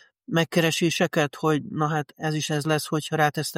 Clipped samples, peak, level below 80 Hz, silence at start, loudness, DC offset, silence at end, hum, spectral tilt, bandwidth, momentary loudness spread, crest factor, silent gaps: under 0.1%; -8 dBFS; -66 dBFS; 0.3 s; -24 LUFS; under 0.1%; 0 s; none; -4.5 dB/octave; 16.5 kHz; 5 LU; 16 dB; none